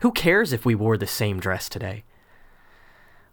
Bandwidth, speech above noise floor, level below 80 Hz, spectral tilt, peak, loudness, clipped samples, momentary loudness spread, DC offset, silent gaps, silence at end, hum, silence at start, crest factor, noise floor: over 20 kHz; 30 dB; -50 dBFS; -5.5 dB/octave; -6 dBFS; -23 LUFS; under 0.1%; 14 LU; under 0.1%; none; 1.3 s; none; 0 s; 18 dB; -52 dBFS